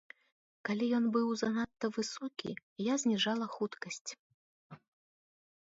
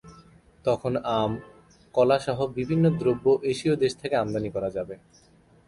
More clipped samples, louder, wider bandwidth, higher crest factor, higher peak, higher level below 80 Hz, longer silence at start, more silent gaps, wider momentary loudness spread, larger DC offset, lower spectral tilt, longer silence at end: neither; second, -35 LUFS vs -25 LUFS; second, 7.8 kHz vs 11.5 kHz; about the same, 18 dB vs 18 dB; second, -20 dBFS vs -8 dBFS; second, -78 dBFS vs -56 dBFS; first, 0.65 s vs 0.05 s; first, 2.63-2.76 s, 4.01-4.05 s, 4.19-4.70 s vs none; first, 13 LU vs 9 LU; neither; second, -4 dB/octave vs -7 dB/octave; first, 0.9 s vs 0.7 s